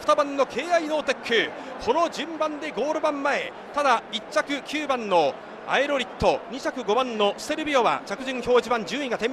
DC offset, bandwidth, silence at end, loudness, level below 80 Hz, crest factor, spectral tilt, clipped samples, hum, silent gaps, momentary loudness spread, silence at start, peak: under 0.1%; 14 kHz; 0 s; -25 LUFS; -54 dBFS; 18 dB; -3.5 dB/octave; under 0.1%; none; none; 7 LU; 0 s; -8 dBFS